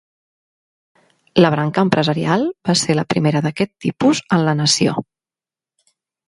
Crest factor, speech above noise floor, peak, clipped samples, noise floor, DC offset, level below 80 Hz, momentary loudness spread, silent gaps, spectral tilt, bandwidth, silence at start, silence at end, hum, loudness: 18 dB; over 74 dB; 0 dBFS; under 0.1%; under -90 dBFS; under 0.1%; -56 dBFS; 6 LU; none; -5 dB/octave; 11.5 kHz; 1.35 s; 1.25 s; none; -17 LUFS